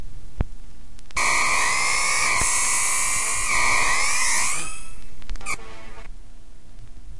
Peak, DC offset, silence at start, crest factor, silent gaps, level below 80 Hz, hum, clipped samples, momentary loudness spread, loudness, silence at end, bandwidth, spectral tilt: -4 dBFS; 6%; 0 s; 20 dB; none; -38 dBFS; none; under 0.1%; 15 LU; -20 LUFS; 0 s; 11.5 kHz; 0 dB/octave